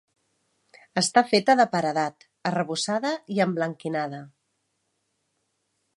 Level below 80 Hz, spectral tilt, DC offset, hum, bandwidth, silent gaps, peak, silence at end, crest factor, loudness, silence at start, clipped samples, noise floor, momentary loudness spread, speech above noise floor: -76 dBFS; -4 dB/octave; under 0.1%; none; 11.5 kHz; none; -4 dBFS; 1.7 s; 24 dB; -24 LUFS; 0.95 s; under 0.1%; -75 dBFS; 11 LU; 51 dB